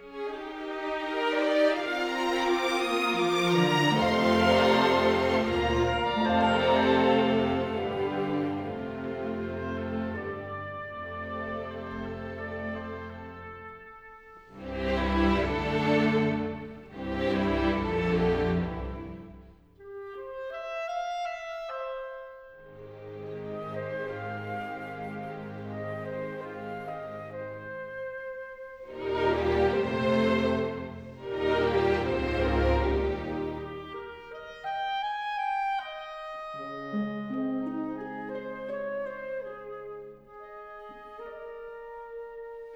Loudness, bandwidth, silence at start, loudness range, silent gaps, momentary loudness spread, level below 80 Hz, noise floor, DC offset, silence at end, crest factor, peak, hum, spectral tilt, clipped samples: -29 LUFS; 19 kHz; 0 s; 14 LU; none; 18 LU; -44 dBFS; -52 dBFS; under 0.1%; 0 s; 18 dB; -10 dBFS; none; -6 dB/octave; under 0.1%